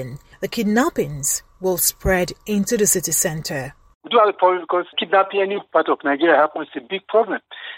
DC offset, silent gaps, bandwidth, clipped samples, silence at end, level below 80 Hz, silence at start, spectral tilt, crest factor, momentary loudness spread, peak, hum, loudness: under 0.1%; 3.95-4.01 s; 16.5 kHz; under 0.1%; 0 s; -44 dBFS; 0 s; -3.5 dB/octave; 16 dB; 11 LU; -4 dBFS; none; -19 LUFS